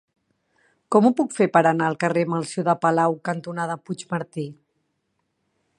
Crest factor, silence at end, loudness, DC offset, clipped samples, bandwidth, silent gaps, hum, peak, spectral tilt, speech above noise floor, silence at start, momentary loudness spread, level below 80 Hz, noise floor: 20 dB; 1.25 s; -22 LUFS; under 0.1%; under 0.1%; 11 kHz; none; none; -2 dBFS; -6.5 dB/octave; 53 dB; 0.9 s; 12 LU; -74 dBFS; -74 dBFS